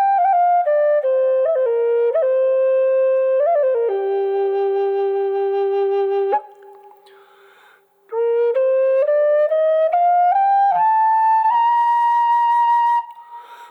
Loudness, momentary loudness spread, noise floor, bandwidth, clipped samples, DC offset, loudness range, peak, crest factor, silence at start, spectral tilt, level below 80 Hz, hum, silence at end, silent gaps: -17 LUFS; 5 LU; -52 dBFS; 5 kHz; under 0.1%; under 0.1%; 6 LU; -8 dBFS; 8 dB; 0 s; -4.5 dB/octave; -76 dBFS; none; 0.05 s; none